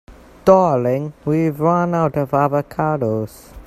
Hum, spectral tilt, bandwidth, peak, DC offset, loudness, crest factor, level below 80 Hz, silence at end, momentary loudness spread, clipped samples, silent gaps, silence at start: none; -8.5 dB/octave; 14.5 kHz; 0 dBFS; under 0.1%; -18 LUFS; 18 dB; -46 dBFS; 0.05 s; 9 LU; under 0.1%; none; 0.1 s